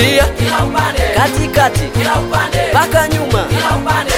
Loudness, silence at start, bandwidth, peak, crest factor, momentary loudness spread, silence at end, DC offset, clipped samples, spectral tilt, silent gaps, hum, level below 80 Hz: -13 LUFS; 0 s; 17.5 kHz; 0 dBFS; 12 dB; 3 LU; 0 s; 0.4%; under 0.1%; -4.5 dB/octave; none; none; -24 dBFS